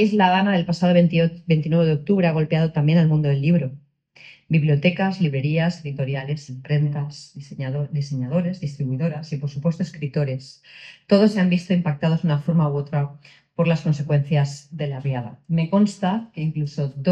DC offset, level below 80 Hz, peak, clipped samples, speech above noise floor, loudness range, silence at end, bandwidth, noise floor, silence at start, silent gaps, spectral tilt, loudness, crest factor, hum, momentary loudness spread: under 0.1%; -56 dBFS; -2 dBFS; under 0.1%; 29 dB; 7 LU; 0 s; 8.4 kHz; -49 dBFS; 0 s; none; -8 dB/octave; -21 LUFS; 18 dB; none; 12 LU